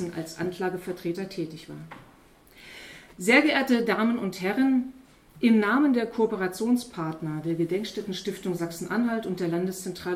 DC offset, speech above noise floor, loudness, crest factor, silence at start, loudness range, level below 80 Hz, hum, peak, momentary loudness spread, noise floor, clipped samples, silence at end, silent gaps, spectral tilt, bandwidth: under 0.1%; 29 dB; -26 LUFS; 20 dB; 0 s; 6 LU; -62 dBFS; none; -6 dBFS; 18 LU; -55 dBFS; under 0.1%; 0 s; none; -5.5 dB/octave; 16 kHz